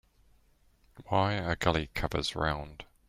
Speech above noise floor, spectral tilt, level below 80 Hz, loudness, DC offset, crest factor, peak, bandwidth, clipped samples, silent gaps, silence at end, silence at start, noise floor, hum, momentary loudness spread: 35 dB; -5.5 dB/octave; -48 dBFS; -31 LUFS; under 0.1%; 24 dB; -10 dBFS; 16 kHz; under 0.1%; none; 0.25 s; 0.95 s; -65 dBFS; none; 6 LU